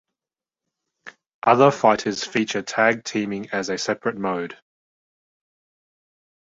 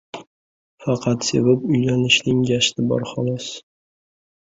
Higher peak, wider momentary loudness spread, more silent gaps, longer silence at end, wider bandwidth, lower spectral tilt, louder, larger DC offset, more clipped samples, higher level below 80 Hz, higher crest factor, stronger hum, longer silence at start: about the same, -2 dBFS vs -2 dBFS; second, 11 LU vs 16 LU; second, 1.26-1.42 s vs 0.27-0.78 s; first, 1.95 s vs 1 s; about the same, 8 kHz vs 8 kHz; about the same, -4.5 dB/octave vs -4.5 dB/octave; about the same, -21 LUFS vs -19 LUFS; neither; neither; second, -66 dBFS vs -54 dBFS; about the same, 22 dB vs 20 dB; neither; first, 1.05 s vs 0.15 s